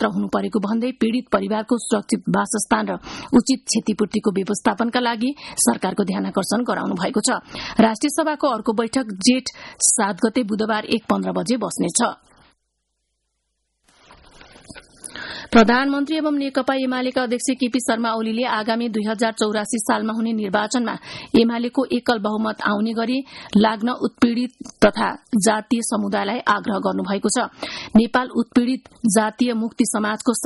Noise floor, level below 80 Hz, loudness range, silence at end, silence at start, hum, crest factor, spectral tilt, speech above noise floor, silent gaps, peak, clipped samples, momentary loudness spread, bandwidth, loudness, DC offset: -74 dBFS; -52 dBFS; 3 LU; 0 s; 0 s; none; 18 dB; -4 dB/octave; 54 dB; none; -4 dBFS; under 0.1%; 6 LU; 11.5 kHz; -20 LUFS; under 0.1%